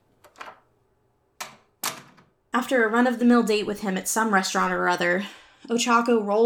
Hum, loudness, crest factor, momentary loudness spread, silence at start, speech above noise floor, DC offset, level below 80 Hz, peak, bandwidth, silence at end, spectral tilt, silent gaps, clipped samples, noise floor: none; -23 LUFS; 18 dB; 20 LU; 0.4 s; 45 dB; under 0.1%; -66 dBFS; -6 dBFS; 18.5 kHz; 0 s; -3.5 dB/octave; none; under 0.1%; -67 dBFS